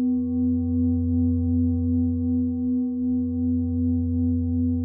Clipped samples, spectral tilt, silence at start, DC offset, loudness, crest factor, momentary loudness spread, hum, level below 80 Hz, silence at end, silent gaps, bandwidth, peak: under 0.1%; -18 dB/octave; 0 s; under 0.1%; -24 LUFS; 8 dB; 2 LU; none; -46 dBFS; 0 s; none; 1.2 kHz; -14 dBFS